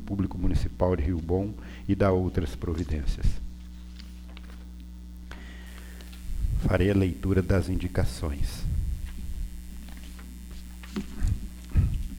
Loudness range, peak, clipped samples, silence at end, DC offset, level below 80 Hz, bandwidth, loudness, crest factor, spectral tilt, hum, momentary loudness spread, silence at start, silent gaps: 9 LU; -10 dBFS; under 0.1%; 0 s; under 0.1%; -32 dBFS; 16.5 kHz; -29 LUFS; 18 dB; -7.5 dB/octave; none; 19 LU; 0 s; none